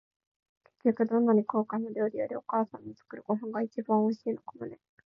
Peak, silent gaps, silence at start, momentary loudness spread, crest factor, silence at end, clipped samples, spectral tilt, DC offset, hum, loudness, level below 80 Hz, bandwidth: -14 dBFS; none; 0.85 s; 18 LU; 16 dB; 0.35 s; under 0.1%; -10 dB/octave; under 0.1%; none; -30 LUFS; -80 dBFS; 5.8 kHz